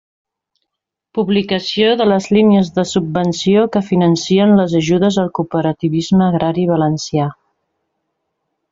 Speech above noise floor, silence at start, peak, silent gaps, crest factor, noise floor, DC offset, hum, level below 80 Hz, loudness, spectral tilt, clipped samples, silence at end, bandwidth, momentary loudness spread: 66 dB; 1.15 s; -2 dBFS; none; 12 dB; -79 dBFS; under 0.1%; none; -52 dBFS; -14 LUFS; -6.5 dB/octave; under 0.1%; 1.4 s; 7.8 kHz; 7 LU